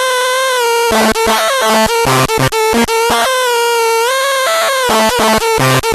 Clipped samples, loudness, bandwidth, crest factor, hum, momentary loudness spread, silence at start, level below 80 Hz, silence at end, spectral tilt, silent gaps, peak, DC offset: under 0.1%; -11 LUFS; 14 kHz; 10 dB; none; 2 LU; 0 s; -36 dBFS; 0 s; -3 dB/octave; none; 0 dBFS; under 0.1%